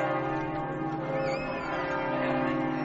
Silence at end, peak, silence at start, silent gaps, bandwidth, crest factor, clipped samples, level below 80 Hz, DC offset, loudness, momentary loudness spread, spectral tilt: 0 s; -16 dBFS; 0 s; none; 7.6 kHz; 14 dB; under 0.1%; -54 dBFS; under 0.1%; -30 LUFS; 4 LU; -5 dB/octave